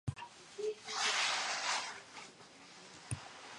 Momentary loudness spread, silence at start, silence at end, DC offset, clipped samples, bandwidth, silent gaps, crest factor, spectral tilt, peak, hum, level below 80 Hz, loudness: 21 LU; 0.05 s; 0 s; under 0.1%; under 0.1%; 11.5 kHz; none; 18 dB; -1.5 dB/octave; -22 dBFS; none; -64 dBFS; -37 LUFS